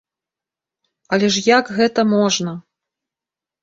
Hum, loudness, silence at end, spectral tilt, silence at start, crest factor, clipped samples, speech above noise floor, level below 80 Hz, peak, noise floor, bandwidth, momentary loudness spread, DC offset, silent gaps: none; -16 LUFS; 1 s; -4 dB/octave; 1.1 s; 18 dB; under 0.1%; 72 dB; -62 dBFS; -2 dBFS; -88 dBFS; 8 kHz; 9 LU; under 0.1%; none